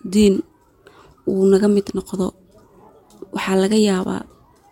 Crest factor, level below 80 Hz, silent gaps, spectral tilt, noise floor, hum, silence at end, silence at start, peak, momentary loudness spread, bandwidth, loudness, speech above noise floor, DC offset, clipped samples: 16 dB; -48 dBFS; none; -6 dB/octave; -51 dBFS; none; 0.5 s; 0.05 s; -4 dBFS; 12 LU; 16 kHz; -19 LUFS; 34 dB; under 0.1%; under 0.1%